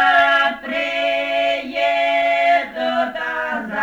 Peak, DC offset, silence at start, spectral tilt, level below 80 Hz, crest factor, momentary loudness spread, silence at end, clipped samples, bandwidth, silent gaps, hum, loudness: -4 dBFS; under 0.1%; 0 s; -3 dB/octave; -58 dBFS; 14 dB; 8 LU; 0 s; under 0.1%; 8.8 kHz; none; none; -18 LUFS